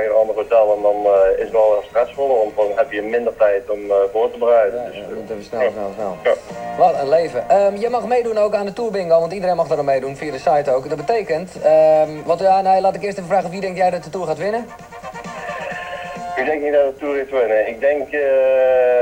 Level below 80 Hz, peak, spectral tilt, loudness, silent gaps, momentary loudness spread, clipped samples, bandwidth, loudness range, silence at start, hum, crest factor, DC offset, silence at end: -52 dBFS; -2 dBFS; -5.5 dB/octave; -17 LUFS; none; 12 LU; under 0.1%; 10 kHz; 5 LU; 0 s; none; 16 dB; under 0.1%; 0 s